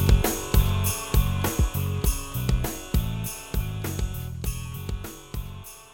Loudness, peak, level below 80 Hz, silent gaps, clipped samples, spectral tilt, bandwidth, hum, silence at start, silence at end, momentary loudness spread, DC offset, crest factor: -27 LUFS; -6 dBFS; -28 dBFS; none; under 0.1%; -5 dB/octave; 20 kHz; none; 0 s; 0.05 s; 13 LU; under 0.1%; 20 dB